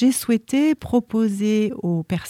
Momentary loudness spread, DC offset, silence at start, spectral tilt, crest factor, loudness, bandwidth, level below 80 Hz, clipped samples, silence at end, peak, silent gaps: 4 LU; under 0.1%; 0 s; -6 dB/octave; 14 dB; -21 LUFS; 16 kHz; -52 dBFS; under 0.1%; 0 s; -6 dBFS; none